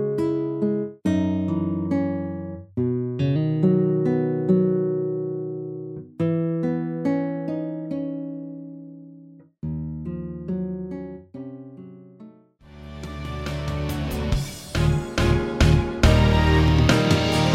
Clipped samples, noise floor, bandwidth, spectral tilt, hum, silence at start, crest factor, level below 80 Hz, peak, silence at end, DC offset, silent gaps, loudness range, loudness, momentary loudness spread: under 0.1%; -49 dBFS; 15.5 kHz; -6.5 dB/octave; none; 0 s; 20 dB; -32 dBFS; -4 dBFS; 0 s; under 0.1%; none; 12 LU; -23 LUFS; 19 LU